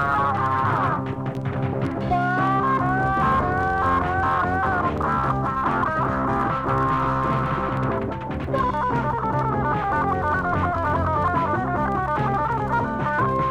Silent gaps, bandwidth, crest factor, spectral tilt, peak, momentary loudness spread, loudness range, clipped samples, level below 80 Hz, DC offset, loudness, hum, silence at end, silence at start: none; 9.6 kHz; 14 dB; -8 dB/octave; -8 dBFS; 4 LU; 2 LU; under 0.1%; -38 dBFS; under 0.1%; -22 LUFS; none; 0 s; 0 s